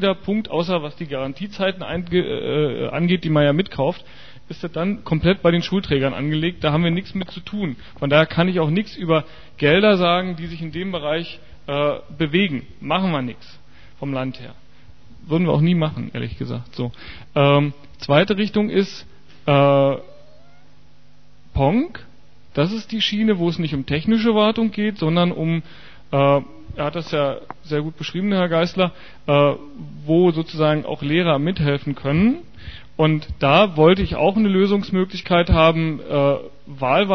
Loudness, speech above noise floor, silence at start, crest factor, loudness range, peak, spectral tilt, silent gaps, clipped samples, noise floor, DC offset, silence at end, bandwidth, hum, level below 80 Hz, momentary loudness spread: -20 LUFS; 34 dB; 0 s; 20 dB; 6 LU; 0 dBFS; -7.5 dB/octave; none; under 0.1%; -53 dBFS; 1%; 0 s; 6.4 kHz; none; -40 dBFS; 13 LU